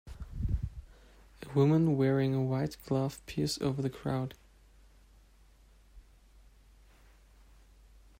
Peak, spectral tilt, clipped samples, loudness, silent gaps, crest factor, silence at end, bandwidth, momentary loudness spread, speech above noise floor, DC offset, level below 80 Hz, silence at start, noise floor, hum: -14 dBFS; -7 dB/octave; under 0.1%; -32 LUFS; none; 20 dB; 2.2 s; 16 kHz; 15 LU; 31 dB; under 0.1%; -48 dBFS; 0.05 s; -60 dBFS; none